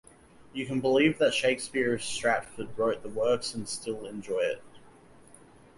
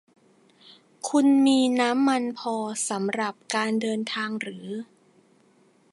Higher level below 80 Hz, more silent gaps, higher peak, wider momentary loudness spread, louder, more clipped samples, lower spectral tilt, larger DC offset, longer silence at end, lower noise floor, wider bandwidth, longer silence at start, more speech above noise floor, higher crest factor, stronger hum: first, -62 dBFS vs -80 dBFS; neither; second, -12 dBFS vs -8 dBFS; about the same, 13 LU vs 14 LU; second, -29 LUFS vs -24 LUFS; neither; about the same, -4 dB/octave vs -3.5 dB/octave; neither; second, 0.85 s vs 1.1 s; second, -55 dBFS vs -61 dBFS; about the same, 11.5 kHz vs 11.5 kHz; second, 0.4 s vs 1.05 s; second, 26 dB vs 37 dB; about the same, 18 dB vs 18 dB; neither